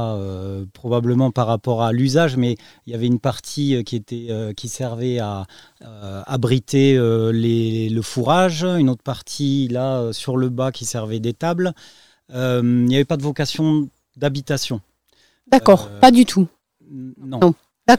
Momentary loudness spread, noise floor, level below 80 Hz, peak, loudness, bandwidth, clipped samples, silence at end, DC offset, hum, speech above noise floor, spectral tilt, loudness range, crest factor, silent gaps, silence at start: 15 LU; -60 dBFS; -52 dBFS; 0 dBFS; -19 LUFS; 15.5 kHz; under 0.1%; 0 s; 0.3%; none; 42 dB; -6 dB/octave; 6 LU; 18 dB; none; 0 s